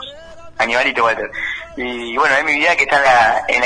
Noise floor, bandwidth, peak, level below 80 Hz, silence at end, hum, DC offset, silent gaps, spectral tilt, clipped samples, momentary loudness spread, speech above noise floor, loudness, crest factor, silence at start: -35 dBFS; 10.5 kHz; -2 dBFS; -46 dBFS; 0 s; none; under 0.1%; none; -2.5 dB/octave; under 0.1%; 13 LU; 20 dB; -15 LUFS; 14 dB; 0 s